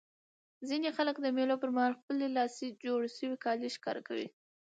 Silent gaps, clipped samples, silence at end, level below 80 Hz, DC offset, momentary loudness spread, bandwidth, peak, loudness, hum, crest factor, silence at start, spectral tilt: 2.03-2.08 s; under 0.1%; 0.4 s; -88 dBFS; under 0.1%; 9 LU; 9 kHz; -18 dBFS; -35 LUFS; none; 18 dB; 0.6 s; -4 dB/octave